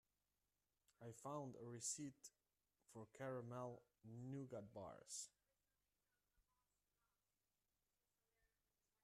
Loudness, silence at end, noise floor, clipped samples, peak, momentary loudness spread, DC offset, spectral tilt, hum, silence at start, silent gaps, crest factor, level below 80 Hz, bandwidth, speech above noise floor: -54 LUFS; 2.6 s; under -90 dBFS; under 0.1%; -36 dBFS; 14 LU; under 0.1%; -4.5 dB/octave; 50 Hz at -90 dBFS; 1 s; none; 22 dB; -90 dBFS; 13 kHz; over 36 dB